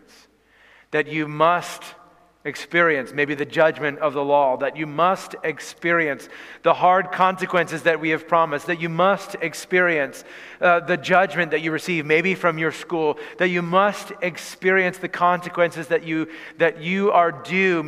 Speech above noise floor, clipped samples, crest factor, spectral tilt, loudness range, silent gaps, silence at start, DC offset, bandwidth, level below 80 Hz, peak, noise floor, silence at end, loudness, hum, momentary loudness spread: 34 dB; under 0.1%; 18 dB; -5 dB/octave; 2 LU; none; 0.9 s; under 0.1%; 15.5 kHz; -68 dBFS; -2 dBFS; -55 dBFS; 0 s; -21 LUFS; none; 10 LU